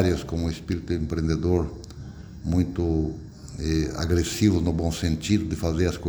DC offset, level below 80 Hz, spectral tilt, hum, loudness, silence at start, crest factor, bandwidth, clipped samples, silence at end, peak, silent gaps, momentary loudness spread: under 0.1%; -36 dBFS; -6.5 dB/octave; none; -26 LUFS; 0 s; 18 dB; over 20 kHz; under 0.1%; 0 s; -8 dBFS; none; 15 LU